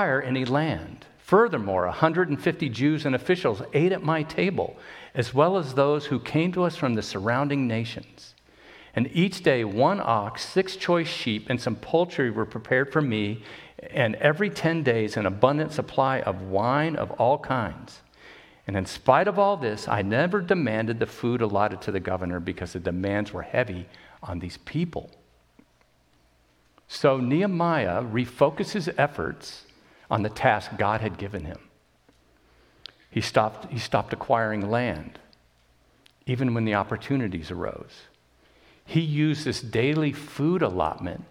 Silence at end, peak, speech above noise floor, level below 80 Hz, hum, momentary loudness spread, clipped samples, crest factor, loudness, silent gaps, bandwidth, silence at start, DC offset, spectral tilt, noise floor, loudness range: 0.05 s; -2 dBFS; 38 dB; -56 dBFS; none; 12 LU; under 0.1%; 24 dB; -25 LUFS; none; 15 kHz; 0 s; under 0.1%; -6.5 dB/octave; -63 dBFS; 6 LU